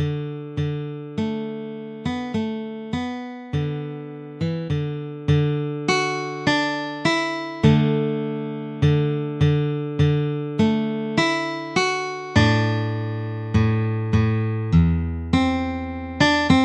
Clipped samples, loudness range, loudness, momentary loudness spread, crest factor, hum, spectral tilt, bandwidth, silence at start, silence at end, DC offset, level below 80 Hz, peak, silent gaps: under 0.1%; 7 LU; -22 LUFS; 11 LU; 18 dB; none; -6.5 dB/octave; 9.4 kHz; 0 s; 0 s; under 0.1%; -40 dBFS; -4 dBFS; none